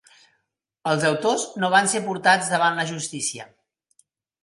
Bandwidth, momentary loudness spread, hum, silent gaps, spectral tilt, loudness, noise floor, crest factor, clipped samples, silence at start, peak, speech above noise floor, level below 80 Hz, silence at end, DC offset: 11.5 kHz; 9 LU; none; none; -3 dB/octave; -21 LUFS; -76 dBFS; 22 dB; under 0.1%; 0.85 s; -2 dBFS; 54 dB; -72 dBFS; 0.95 s; under 0.1%